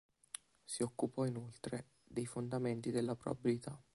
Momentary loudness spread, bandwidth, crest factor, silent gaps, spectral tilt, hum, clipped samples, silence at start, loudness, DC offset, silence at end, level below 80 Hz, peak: 11 LU; 11.5 kHz; 18 dB; none; -6 dB/octave; none; under 0.1%; 0.7 s; -41 LUFS; under 0.1%; 0.15 s; -72 dBFS; -22 dBFS